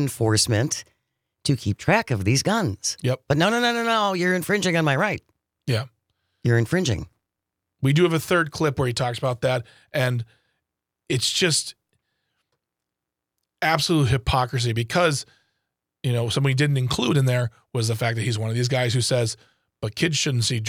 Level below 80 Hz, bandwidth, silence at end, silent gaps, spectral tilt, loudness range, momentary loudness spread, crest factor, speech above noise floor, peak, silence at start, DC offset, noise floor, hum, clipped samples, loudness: -48 dBFS; 16.5 kHz; 0 s; none; -4.5 dB/octave; 4 LU; 9 LU; 20 dB; 63 dB; -4 dBFS; 0 s; under 0.1%; -85 dBFS; none; under 0.1%; -22 LUFS